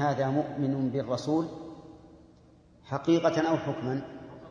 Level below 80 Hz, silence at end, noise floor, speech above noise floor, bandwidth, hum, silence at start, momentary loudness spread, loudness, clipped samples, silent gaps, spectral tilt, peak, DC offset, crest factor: -64 dBFS; 0 s; -57 dBFS; 29 dB; 7.4 kHz; none; 0 s; 19 LU; -29 LUFS; under 0.1%; none; -7 dB/octave; -12 dBFS; under 0.1%; 18 dB